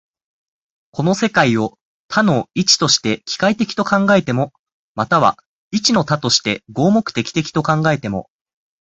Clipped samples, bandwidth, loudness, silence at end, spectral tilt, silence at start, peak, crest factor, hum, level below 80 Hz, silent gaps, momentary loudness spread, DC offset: under 0.1%; 8.4 kHz; -16 LUFS; 0.6 s; -4 dB/octave; 0.95 s; 0 dBFS; 18 dB; none; -52 dBFS; 1.81-2.09 s, 4.59-4.66 s, 4.72-4.95 s, 5.46-5.71 s; 11 LU; under 0.1%